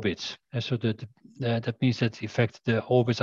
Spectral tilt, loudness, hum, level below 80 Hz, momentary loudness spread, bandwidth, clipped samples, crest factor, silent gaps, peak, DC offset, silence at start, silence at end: -6.5 dB/octave; -28 LUFS; none; -58 dBFS; 9 LU; 7.2 kHz; under 0.1%; 18 dB; none; -10 dBFS; under 0.1%; 0 s; 0 s